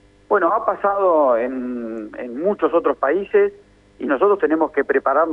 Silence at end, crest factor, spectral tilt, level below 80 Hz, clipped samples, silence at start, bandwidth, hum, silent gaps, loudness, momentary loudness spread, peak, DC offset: 0 s; 14 dB; -8 dB/octave; -58 dBFS; under 0.1%; 0.3 s; 3.9 kHz; 50 Hz at -55 dBFS; none; -19 LUFS; 11 LU; -4 dBFS; under 0.1%